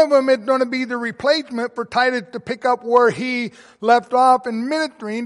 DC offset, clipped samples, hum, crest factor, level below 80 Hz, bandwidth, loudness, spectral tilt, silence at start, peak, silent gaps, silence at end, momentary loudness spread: under 0.1%; under 0.1%; none; 16 dB; -66 dBFS; 11.5 kHz; -19 LUFS; -4.5 dB/octave; 0 s; -2 dBFS; none; 0 s; 10 LU